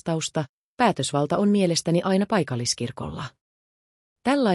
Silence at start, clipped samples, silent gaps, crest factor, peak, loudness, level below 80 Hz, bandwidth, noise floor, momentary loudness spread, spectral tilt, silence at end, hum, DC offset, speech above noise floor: 0.05 s; under 0.1%; 0.49-0.77 s, 3.41-4.16 s; 16 dB; -8 dBFS; -24 LUFS; -60 dBFS; 12 kHz; under -90 dBFS; 12 LU; -5 dB/octave; 0 s; none; under 0.1%; over 67 dB